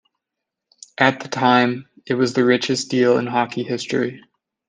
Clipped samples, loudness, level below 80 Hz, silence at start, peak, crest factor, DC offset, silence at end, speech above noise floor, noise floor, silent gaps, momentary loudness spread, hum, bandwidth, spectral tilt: under 0.1%; -19 LUFS; -66 dBFS; 1 s; -2 dBFS; 18 dB; under 0.1%; 0.5 s; 64 dB; -83 dBFS; none; 9 LU; none; 9.6 kHz; -5 dB/octave